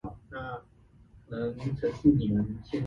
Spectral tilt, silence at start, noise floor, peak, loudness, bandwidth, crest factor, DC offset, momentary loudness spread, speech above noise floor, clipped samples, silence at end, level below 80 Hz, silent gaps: -9.5 dB/octave; 0.05 s; -58 dBFS; -10 dBFS; -30 LUFS; 7 kHz; 20 dB; under 0.1%; 17 LU; 30 dB; under 0.1%; 0 s; -50 dBFS; none